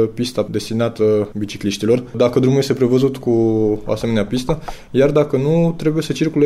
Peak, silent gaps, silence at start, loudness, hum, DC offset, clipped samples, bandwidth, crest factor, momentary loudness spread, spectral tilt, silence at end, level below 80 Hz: -4 dBFS; none; 0 s; -17 LUFS; none; under 0.1%; under 0.1%; 14.5 kHz; 14 dB; 7 LU; -7 dB/octave; 0 s; -40 dBFS